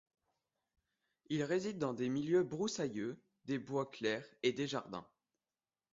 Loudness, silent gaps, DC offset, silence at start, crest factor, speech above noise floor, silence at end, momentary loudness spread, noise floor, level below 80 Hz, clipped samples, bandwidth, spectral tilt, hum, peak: -38 LUFS; none; under 0.1%; 1.3 s; 18 dB; over 52 dB; 0.9 s; 10 LU; under -90 dBFS; -78 dBFS; under 0.1%; 7.6 kHz; -5 dB/octave; none; -22 dBFS